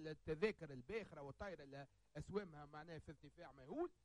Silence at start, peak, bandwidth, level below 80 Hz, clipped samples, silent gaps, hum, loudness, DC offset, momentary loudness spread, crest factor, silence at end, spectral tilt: 0 s; -26 dBFS; 10.5 kHz; -70 dBFS; under 0.1%; none; none; -50 LUFS; under 0.1%; 16 LU; 24 dB; 0.1 s; -6.5 dB/octave